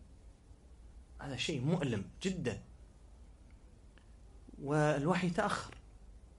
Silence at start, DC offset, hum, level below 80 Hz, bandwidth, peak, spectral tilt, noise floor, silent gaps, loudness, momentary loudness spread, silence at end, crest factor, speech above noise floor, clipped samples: 0 s; under 0.1%; none; -56 dBFS; 11.5 kHz; -18 dBFS; -6 dB/octave; -58 dBFS; none; -36 LUFS; 18 LU; 0.1 s; 20 dB; 24 dB; under 0.1%